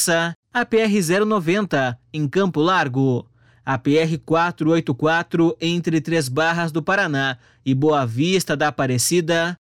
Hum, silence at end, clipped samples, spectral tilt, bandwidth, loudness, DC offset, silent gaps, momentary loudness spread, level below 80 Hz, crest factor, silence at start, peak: none; 0.05 s; under 0.1%; -5 dB/octave; 16.5 kHz; -20 LUFS; 0.2%; 0.36-0.43 s; 5 LU; -60 dBFS; 12 dB; 0 s; -6 dBFS